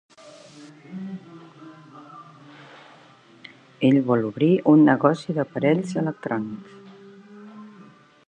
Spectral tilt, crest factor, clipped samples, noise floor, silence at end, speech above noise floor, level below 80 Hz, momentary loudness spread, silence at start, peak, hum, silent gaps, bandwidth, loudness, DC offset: -8 dB/octave; 22 dB; under 0.1%; -51 dBFS; 0.6 s; 31 dB; -70 dBFS; 28 LU; 0.25 s; -2 dBFS; none; none; 9.2 kHz; -21 LUFS; under 0.1%